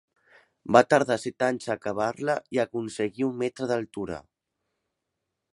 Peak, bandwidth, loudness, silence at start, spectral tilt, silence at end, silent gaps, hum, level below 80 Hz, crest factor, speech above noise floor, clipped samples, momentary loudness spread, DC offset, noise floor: -2 dBFS; 11.5 kHz; -26 LUFS; 0.65 s; -5.5 dB/octave; 1.3 s; none; none; -64 dBFS; 26 dB; 57 dB; under 0.1%; 14 LU; under 0.1%; -83 dBFS